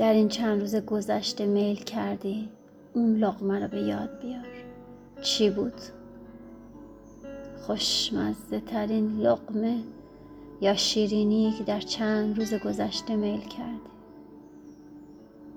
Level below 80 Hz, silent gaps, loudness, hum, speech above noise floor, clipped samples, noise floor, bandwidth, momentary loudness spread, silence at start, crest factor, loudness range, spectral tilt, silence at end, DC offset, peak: -58 dBFS; none; -27 LUFS; none; 21 dB; under 0.1%; -48 dBFS; 15 kHz; 24 LU; 0 s; 18 dB; 5 LU; -4.5 dB/octave; 0 s; under 0.1%; -10 dBFS